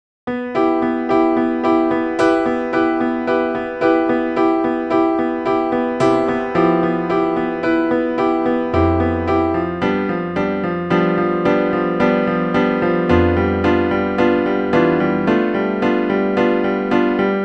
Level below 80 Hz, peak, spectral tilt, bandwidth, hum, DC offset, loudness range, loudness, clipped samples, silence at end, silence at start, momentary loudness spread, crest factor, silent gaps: -42 dBFS; 0 dBFS; -8 dB/octave; 8.4 kHz; none; under 0.1%; 2 LU; -17 LUFS; under 0.1%; 0 s; 0.25 s; 4 LU; 16 dB; none